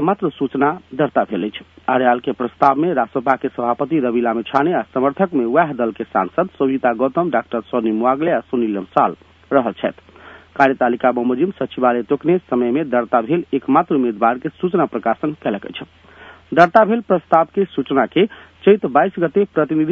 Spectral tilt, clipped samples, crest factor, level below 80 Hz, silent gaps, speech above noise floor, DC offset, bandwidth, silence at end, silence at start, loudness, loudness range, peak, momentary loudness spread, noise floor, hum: -8.5 dB/octave; under 0.1%; 18 dB; -60 dBFS; none; 26 dB; under 0.1%; 6.8 kHz; 0 s; 0 s; -18 LUFS; 3 LU; 0 dBFS; 6 LU; -43 dBFS; none